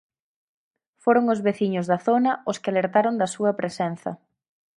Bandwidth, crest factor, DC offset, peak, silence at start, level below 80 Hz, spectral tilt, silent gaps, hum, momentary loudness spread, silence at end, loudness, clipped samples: 11.5 kHz; 18 dB; under 0.1%; -6 dBFS; 1.05 s; -72 dBFS; -6 dB/octave; none; none; 8 LU; 0.6 s; -23 LUFS; under 0.1%